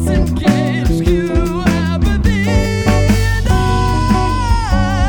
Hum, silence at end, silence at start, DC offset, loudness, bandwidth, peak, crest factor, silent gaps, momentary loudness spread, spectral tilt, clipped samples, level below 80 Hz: none; 0 s; 0 s; under 0.1%; -15 LUFS; 18 kHz; -2 dBFS; 12 dB; none; 2 LU; -6.5 dB/octave; under 0.1%; -18 dBFS